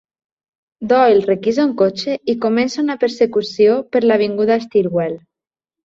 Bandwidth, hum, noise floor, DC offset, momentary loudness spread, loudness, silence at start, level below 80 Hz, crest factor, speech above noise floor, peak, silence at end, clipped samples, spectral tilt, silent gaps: 7.6 kHz; none; -86 dBFS; under 0.1%; 7 LU; -16 LUFS; 0.8 s; -60 dBFS; 14 dB; 71 dB; -2 dBFS; 0.65 s; under 0.1%; -6 dB/octave; none